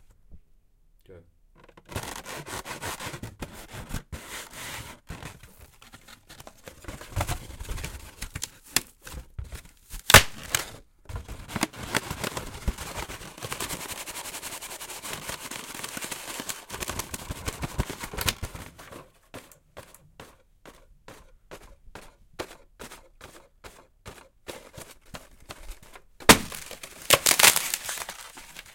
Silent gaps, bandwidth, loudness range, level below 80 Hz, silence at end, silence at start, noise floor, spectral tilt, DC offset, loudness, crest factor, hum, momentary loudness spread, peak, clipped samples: none; 17 kHz; 23 LU; -44 dBFS; 0 s; 0.3 s; -60 dBFS; -2 dB/octave; under 0.1%; -26 LUFS; 30 dB; none; 28 LU; 0 dBFS; under 0.1%